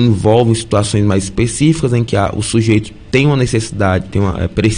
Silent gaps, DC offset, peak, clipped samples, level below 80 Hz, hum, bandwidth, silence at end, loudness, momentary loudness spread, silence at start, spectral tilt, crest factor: none; under 0.1%; 0 dBFS; under 0.1%; -32 dBFS; none; 10 kHz; 0 s; -14 LUFS; 5 LU; 0 s; -6 dB/octave; 12 dB